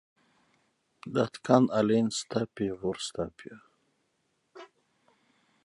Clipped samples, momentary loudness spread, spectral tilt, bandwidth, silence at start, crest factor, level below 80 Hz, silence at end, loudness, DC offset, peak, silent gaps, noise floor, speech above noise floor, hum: under 0.1%; 17 LU; -5.5 dB/octave; 11.5 kHz; 1.05 s; 26 dB; -64 dBFS; 1 s; -29 LUFS; under 0.1%; -6 dBFS; none; -76 dBFS; 47 dB; none